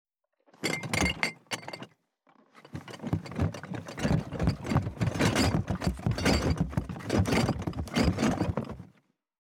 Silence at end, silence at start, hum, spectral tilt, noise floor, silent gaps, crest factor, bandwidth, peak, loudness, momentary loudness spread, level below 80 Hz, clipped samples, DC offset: 0.65 s; 0.6 s; none; -5.5 dB/octave; -66 dBFS; none; 24 dB; 17.5 kHz; -6 dBFS; -30 LUFS; 14 LU; -44 dBFS; under 0.1%; under 0.1%